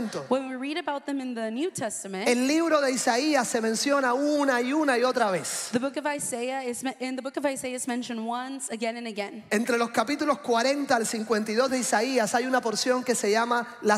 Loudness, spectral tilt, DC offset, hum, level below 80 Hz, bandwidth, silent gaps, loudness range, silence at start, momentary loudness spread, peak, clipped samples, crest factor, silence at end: -26 LUFS; -3 dB/octave; under 0.1%; none; -74 dBFS; 16 kHz; none; 6 LU; 0 s; 8 LU; -10 dBFS; under 0.1%; 16 dB; 0 s